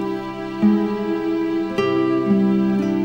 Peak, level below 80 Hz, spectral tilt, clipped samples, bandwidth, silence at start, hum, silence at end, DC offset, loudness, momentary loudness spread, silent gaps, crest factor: -6 dBFS; -54 dBFS; -8 dB/octave; under 0.1%; 7.2 kHz; 0 s; none; 0 s; under 0.1%; -20 LUFS; 6 LU; none; 14 dB